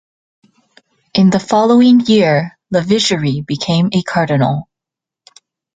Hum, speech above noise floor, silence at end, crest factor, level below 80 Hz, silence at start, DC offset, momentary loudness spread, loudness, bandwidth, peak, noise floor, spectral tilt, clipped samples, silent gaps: none; 73 dB; 1.15 s; 14 dB; -52 dBFS; 1.15 s; under 0.1%; 9 LU; -13 LUFS; 9.2 kHz; 0 dBFS; -85 dBFS; -6 dB/octave; under 0.1%; none